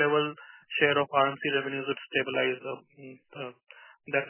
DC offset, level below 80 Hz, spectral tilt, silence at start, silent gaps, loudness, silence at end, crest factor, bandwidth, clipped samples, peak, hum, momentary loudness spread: under 0.1%; -82 dBFS; -2 dB/octave; 0 s; none; -28 LUFS; 0 s; 20 dB; 3.2 kHz; under 0.1%; -10 dBFS; none; 22 LU